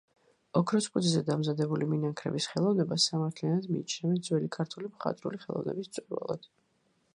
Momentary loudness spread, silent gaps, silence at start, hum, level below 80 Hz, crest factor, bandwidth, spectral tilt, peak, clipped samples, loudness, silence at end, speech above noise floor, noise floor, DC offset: 9 LU; none; 0.55 s; none; -74 dBFS; 20 dB; 11.5 kHz; -5.5 dB/octave; -12 dBFS; under 0.1%; -31 LUFS; 0.7 s; 42 dB; -72 dBFS; under 0.1%